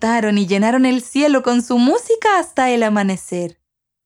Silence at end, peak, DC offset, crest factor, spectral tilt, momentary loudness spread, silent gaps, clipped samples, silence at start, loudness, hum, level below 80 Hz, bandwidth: 0.55 s; -2 dBFS; under 0.1%; 14 dB; -5 dB/octave; 8 LU; none; under 0.1%; 0 s; -16 LUFS; none; -60 dBFS; 12.5 kHz